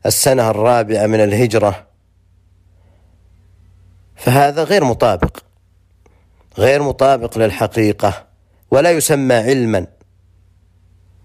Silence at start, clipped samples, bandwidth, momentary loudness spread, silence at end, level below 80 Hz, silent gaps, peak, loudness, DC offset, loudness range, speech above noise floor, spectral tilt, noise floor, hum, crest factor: 0.05 s; under 0.1%; 15.5 kHz; 8 LU; 1.4 s; -40 dBFS; none; -2 dBFS; -14 LUFS; under 0.1%; 5 LU; 40 dB; -5 dB/octave; -53 dBFS; none; 14 dB